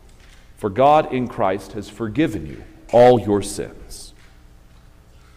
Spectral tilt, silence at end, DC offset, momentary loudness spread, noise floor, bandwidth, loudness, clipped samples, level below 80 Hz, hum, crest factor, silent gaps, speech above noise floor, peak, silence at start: -6 dB/octave; 1.3 s; under 0.1%; 23 LU; -47 dBFS; 15.5 kHz; -18 LUFS; under 0.1%; -44 dBFS; 60 Hz at -55 dBFS; 18 dB; none; 29 dB; -2 dBFS; 0.6 s